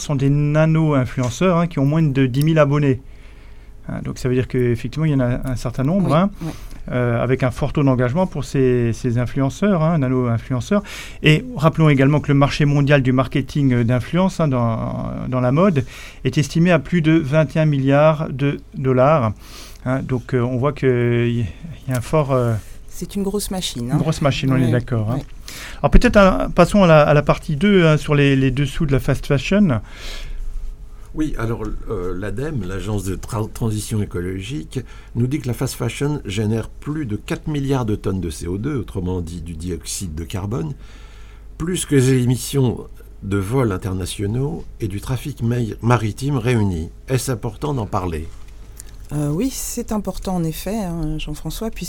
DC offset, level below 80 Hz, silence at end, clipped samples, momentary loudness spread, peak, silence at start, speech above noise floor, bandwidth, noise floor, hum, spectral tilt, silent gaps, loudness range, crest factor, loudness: under 0.1%; -32 dBFS; 0 s; under 0.1%; 13 LU; 0 dBFS; 0 s; 20 dB; 17.5 kHz; -38 dBFS; none; -6.5 dB/octave; none; 9 LU; 18 dB; -19 LUFS